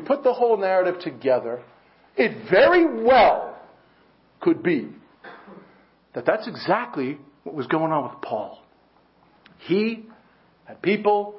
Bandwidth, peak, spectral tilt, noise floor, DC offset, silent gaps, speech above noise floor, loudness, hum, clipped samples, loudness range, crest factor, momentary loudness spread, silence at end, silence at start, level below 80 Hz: 5.8 kHz; -4 dBFS; -10 dB/octave; -59 dBFS; under 0.1%; none; 38 dB; -22 LUFS; none; under 0.1%; 8 LU; 20 dB; 20 LU; 0 s; 0 s; -60 dBFS